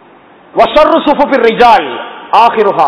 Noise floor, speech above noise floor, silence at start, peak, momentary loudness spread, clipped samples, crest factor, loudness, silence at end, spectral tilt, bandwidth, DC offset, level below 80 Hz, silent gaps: -39 dBFS; 32 dB; 0.55 s; 0 dBFS; 11 LU; 5%; 8 dB; -8 LUFS; 0 s; -5.5 dB/octave; 5.4 kHz; under 0.1%; -40 dBFS; none